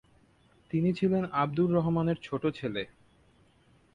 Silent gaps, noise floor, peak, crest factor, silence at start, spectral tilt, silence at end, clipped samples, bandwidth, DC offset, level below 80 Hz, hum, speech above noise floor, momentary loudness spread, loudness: none; -64 dBFS; -14 dBFS; 16 dB; 0.75 s; -9 dB/octave; 1.1 s; under 0.1%; 7.4 kHz; under 0.1%; -60 dBFS; none; 35 dB; 9 LU; -29 LUFS